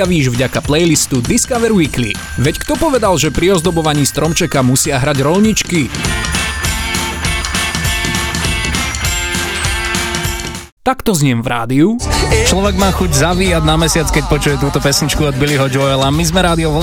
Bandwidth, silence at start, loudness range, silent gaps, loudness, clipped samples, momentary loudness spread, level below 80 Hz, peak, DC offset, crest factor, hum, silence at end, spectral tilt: 19.5 kHz; 0 s; 3 LU; 10.72-10.77 s; -13 LUFS; under 0.1%; 5 LU; -24 dBFS; 0 dBFS; under 0.1%; 12 dB; none; 0 s; -4 dB/octave